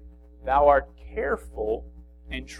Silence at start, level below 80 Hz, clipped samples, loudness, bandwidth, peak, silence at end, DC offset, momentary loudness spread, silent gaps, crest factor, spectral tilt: 0.05 s; -40 dBFS; under 0.1%; -24 LUFS; 11.5 kHz; -6 dBFS; 0 s; under 0.1%; 18 LU; none; 20 dB; -6 dB/octave